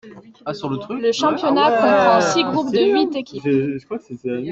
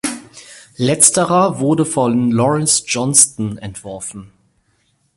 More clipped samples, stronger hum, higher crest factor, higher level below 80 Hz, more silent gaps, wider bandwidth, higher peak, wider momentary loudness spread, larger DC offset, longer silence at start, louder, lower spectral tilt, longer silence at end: neither; neither; about the same, 16 dB vs 16 dB; second, -60 dBFS vs -52 dBFS; neither; second, 8.2 kHz vs 16 kHz; about the same, -2 dBFS vs 0 dBFS; second, 14 LU vs 18 LU; neither; about the same, 0.05 s vs 0.05 s; second, -18 LUFS vs -14 LUFS; first, -5 dB/octave vs -3.5 dB/octave; second, 0 s vs 0.9 s